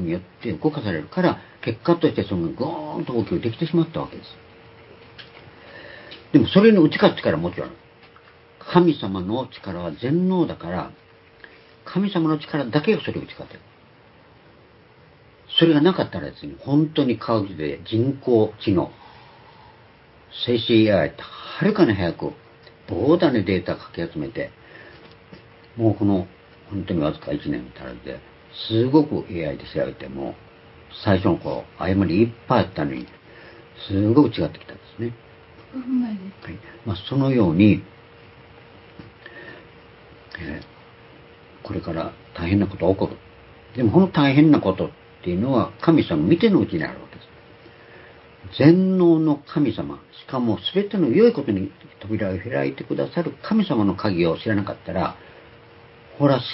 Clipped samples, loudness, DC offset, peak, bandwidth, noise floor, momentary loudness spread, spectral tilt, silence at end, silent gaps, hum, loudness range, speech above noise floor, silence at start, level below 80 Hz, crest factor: under 0.1%; -21 LUFS; under 0.1%; 0 dBFS; 5.8 kHz; -51 dBFS; 20 LU; -11.5 dB/octave; 0 s; none; none; 7 LU; 30 dB; 0 s; -48 dBFS; 22 dB